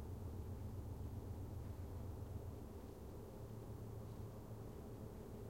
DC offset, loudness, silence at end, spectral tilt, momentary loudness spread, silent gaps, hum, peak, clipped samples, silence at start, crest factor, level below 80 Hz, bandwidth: under 0.1%; -52 LUFS; 0 s; -8 dB/octave; 4 LU; none; none; -36 dBFS; under 0.1%; 0 s; 12 dB; -58 dBFS; 16.5 kHz